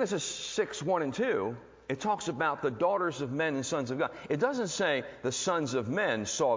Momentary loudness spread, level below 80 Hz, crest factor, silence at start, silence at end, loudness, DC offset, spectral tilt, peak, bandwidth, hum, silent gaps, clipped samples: 4 LU; -66 dBFS; 16 dB; 0 s; 0 s; -31 LUFS; under 0.1%; -4 dB/octave; -16 dBFS; 7.8 kHz; none; none; under 0.1%